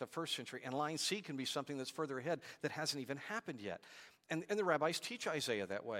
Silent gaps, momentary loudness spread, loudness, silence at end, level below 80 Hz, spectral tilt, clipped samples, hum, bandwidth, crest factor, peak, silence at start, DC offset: none; 9 LU; -41 LUFS; 0 s; -88 dBFS; -3.5 dB/octave; under 0.1%; none; 16.5 kHz; 22 dB; -20 dBFS; 0 s; under 0.1%